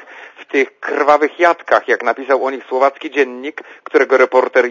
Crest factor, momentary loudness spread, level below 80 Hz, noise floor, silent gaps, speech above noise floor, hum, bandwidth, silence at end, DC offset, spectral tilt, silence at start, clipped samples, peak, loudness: 16 dB; 8 LU; -70 dBFS; -37 dBFS; none; 23 dB; none; 7.4 kHz; 0 s; under 0.1%; -3 dB/octave; 0.1 s; under 0.1%; 0 dBFS; -15 LUFS